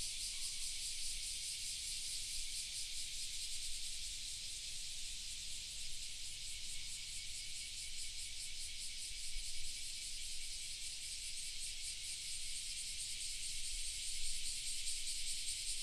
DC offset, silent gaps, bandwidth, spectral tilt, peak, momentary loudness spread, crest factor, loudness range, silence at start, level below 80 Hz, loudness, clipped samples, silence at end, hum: under 0.1%; none; 15 kHz; 2 dB/octave; -24 dBFS; 4 LU; 18 dB; 3 LU; 0 s; -54 dBFS; -43 LUFS; under 0.1%; 0 s; none